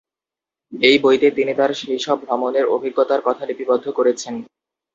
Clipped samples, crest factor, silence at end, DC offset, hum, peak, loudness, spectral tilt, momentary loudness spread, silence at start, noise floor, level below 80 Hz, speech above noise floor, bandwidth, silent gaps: under 0.1%; 18 dB; 0.5 s; under 0.1%; none; 0 dBFS; -18 LUFS; -3.5 dB/octave; 11 LU; 0.7 s; -89 dBFS; -66 dBFS; 71 dB; 7.8 kHz; none